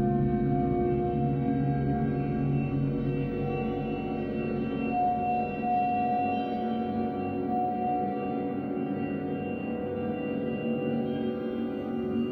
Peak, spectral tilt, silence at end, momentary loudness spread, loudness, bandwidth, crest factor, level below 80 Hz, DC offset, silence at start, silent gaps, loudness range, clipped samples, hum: -16 dBFS; -10.5 dB/octave; 0 s; 5 LU; -30 LUFS; 4.8 kHz; 14 dB; -48 dBFS; under 0.1%; 0 s; none; 3 LU; under 0.1%; none